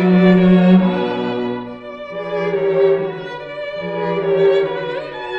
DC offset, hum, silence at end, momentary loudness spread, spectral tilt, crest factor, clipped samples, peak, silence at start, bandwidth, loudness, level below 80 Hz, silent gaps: under 0.1%; none; 0 s; 16 LU; -9.5 dB/octave; 16 dB; under 0.1%; 0 dBFS; 0 s; 5.6 kHz; -16 LUFS; -48 dBFS; none